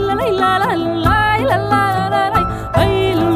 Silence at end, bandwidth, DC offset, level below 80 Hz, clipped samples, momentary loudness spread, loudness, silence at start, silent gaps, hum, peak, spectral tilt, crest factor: 0 s; 16 kHz; under 0.1%; -30 dBFS; under 0.1%; 3 LU; -15 LUFS; 0 s; none; none; -2 dBFS; -6.5 dB/octave; 14 dB